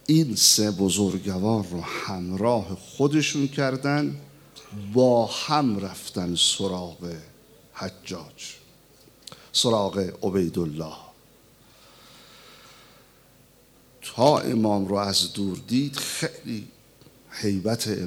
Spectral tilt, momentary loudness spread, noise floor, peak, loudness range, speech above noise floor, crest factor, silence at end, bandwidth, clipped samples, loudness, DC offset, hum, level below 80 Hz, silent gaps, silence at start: -4 dB/octave; 18 LU; -56 dBFS; -4 dBFS; 7 LU; 31 dB; 22 dB; 0 s; over 20 kHz; under 0.1%; -24 LUFS; under 0.1%; none; -64 dBFS; none; 0.1 s